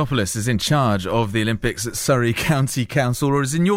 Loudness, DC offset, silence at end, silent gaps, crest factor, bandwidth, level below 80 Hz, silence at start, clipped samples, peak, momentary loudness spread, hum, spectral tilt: -20 LUFS; under 0.1%; 0 s; none; 14 dB; 16.5 kHz; -40 dBFS; 0 s; under 0.1%; -6 dBFS; 3 LU; none; -5 dB/octave